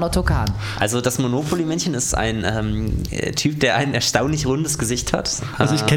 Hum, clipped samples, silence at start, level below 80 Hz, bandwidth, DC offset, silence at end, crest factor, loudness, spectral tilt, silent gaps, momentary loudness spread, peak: none; under 0.1%; 0 s; -32 dBFS; 19 kHz; under 0.1%; 0 s; 18 dB; -20 LUFS; -4.5 dB/octave; none; 5 LU; -2 dBFS